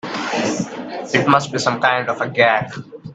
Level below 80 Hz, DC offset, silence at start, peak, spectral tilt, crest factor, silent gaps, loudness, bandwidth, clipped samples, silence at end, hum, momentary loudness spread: -58 dBFS; under 0.1%; 0.05 s; 0 dBFS; -4.5 dB/octave; 18 dB; none; -18 LUFS; 9.2 kHz; under 0.1%; 0 s; none; 12 LU